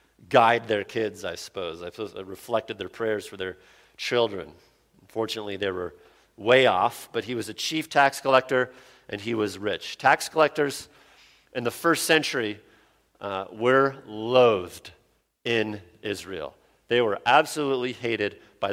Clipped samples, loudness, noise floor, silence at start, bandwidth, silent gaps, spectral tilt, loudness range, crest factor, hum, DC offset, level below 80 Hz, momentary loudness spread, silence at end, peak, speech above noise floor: under 0.1%; -25 LUFS; -61 dBFS; 0.3 s; 16.5 kHz; none; -4 dB/octave; 7 LU; 22 dB; none; under 0.1%; -66 dBFS; 16 LU; 0 s; -4 dBFS; 36 dB